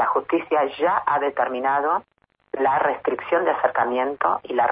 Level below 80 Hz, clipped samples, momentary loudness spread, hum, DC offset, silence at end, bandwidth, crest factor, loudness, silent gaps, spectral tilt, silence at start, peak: -66 dBFS; under 0.1%; 4 LU; none; under 0.1%; 0 s; 5 kHz; 16 dB; -22 LUFS; none; -8.5 dB/octave; 0 s; -6 dBFS